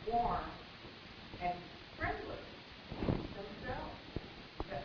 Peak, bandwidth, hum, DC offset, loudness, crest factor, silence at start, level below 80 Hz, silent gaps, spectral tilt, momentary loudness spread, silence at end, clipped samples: -18 dBFS; 5.4 kHz; none; under 0.1%; -43 LUFS; 22 dB; 0 s; -52 dBFS; none; -4.5 dB/octave; 13 LU; 0 s; under 0.1%